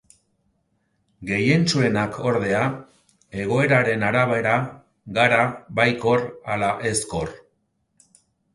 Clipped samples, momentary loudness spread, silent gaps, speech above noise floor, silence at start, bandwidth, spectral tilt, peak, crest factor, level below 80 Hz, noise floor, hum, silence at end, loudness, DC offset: under 0.1%; 11 LU; none; 49 dB; 1.2 s; 11.5 kHz; -5 dB/octave; -2 dBFS; 20 dB; -52 dBFS; -70 dBFS; none; 1.15 s; -21 LUFS; under 0.1%